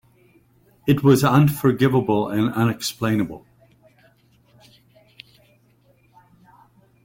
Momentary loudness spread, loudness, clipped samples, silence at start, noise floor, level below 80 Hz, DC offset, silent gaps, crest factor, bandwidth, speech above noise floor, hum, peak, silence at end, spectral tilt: 10 LU; -19 LUFS; under 0.1%; 0.85 s; -58 dBFS; -54 dBFS; under 0.1%; none; 20 dB; 17 kHz; 40 dB; none; -4 dBFS; 3.65 s; -6.5 dB/octave